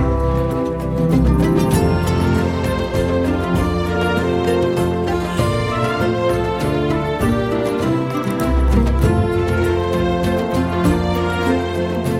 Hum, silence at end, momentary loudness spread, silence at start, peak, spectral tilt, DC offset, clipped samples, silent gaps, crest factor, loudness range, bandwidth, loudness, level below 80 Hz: none; 0 s; 4 LU; 0 s; -2 dBFS; -7 dB/octave; under 0.1%; under 0.1%; none; 14 dB; 1 LU; 16 kHz; -18 LUFS; -26 dBFS